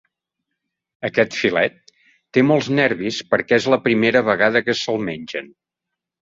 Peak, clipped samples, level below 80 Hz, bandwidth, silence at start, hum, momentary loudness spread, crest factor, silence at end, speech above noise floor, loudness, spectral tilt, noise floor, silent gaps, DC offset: -2 dBFS; under 0.1%; -60 dBFS; 7.8 kHz; 1 s; none; 10 LU; 18 dB; 0.85 s; 65 dB; -18 LUFS; -5 dB/octave; -83 dBFS; none; under 0.1%